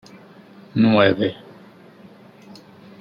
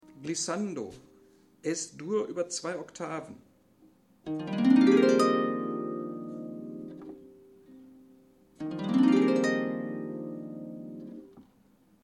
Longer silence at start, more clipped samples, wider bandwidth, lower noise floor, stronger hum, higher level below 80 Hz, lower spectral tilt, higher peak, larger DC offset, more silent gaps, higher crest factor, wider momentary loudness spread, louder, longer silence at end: first, 0.75 s vs 0.15 s; neither; second, 6.8 kHz vs 11 kHz; second, -46 dBFS vs -63 dBFS; neither; first, -62 dBFS vs -74 dBFS; first, -8 dB/octave vs -5 dB/octave; first, -2 dBFS vs -10 dBFS; neither; neither; about the same, 22 dB vs 20 dB; second, 15 LU vs 21 LU; first, -18 LUFS vs -29 LUFS; first, 1.65 s vs 0.6 s